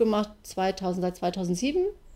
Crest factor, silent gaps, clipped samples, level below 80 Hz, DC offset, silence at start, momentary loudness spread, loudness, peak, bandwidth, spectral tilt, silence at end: 16 dB; none; under 0.1%; -52 dBFS; under 0.1%; 0 s; 4 LU; -28 LUFS; -12 dBFS; 16 kHz; -5.5 dB/octave; 0 s